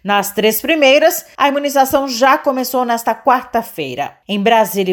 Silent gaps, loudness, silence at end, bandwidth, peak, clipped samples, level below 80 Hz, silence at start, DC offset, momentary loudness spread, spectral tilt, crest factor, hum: none; -14 LUFS; 0 s; over 20 kHz; 0 dBFS; under 0.1%; -54 dBFS; 0.05 s; under 0.1%; 10 LU; -3.5 dB/octave; 14 dB; none